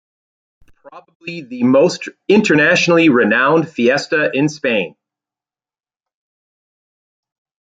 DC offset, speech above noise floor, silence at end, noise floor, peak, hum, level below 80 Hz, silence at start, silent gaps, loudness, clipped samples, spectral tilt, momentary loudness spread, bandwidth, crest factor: under 0.1%; over 76 dB; 2.85 s; under -90 dBFS; 0 dBFS; none; -62 dBFS; 0.85 s; 1.15-1.20 s; -14 LUFS; under 0.1%; -5 dB/octave; 16 LU; 9.2 kHz; 16 dB